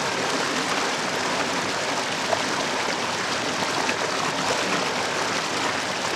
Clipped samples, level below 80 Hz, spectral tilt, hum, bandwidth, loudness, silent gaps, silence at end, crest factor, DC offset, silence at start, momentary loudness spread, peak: under 0.1%; -62 dBFS; -2 dB/octave; none; 17 kHz; -24 LUFS; none; 0 s; 18 dB; under 0.1%; 0 s; 1 LU; -6 dBFS